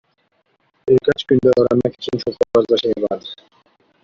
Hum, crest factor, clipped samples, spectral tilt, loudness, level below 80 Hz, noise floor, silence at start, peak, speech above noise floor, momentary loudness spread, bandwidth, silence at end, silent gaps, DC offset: none; 16 dB; under 0.1%; -7 dB/octave; -17 LUFS; -54 dBFS; -64 dBFS; 0.85 s; -2 dBFS; 48 dB; 14 LU; 7.4 kHz; 0.7 s; none; under 0.1%